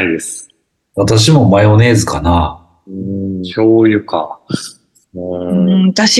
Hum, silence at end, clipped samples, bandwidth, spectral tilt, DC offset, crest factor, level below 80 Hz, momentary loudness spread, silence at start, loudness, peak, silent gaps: none; 0 s; under 0.1%; 12.5 kHz; -5.5 dB/octave; under 0.1%; 12 dB; -32 dBFS; 17 LU; 0 s; -12 LUFS; 0 dBFS; none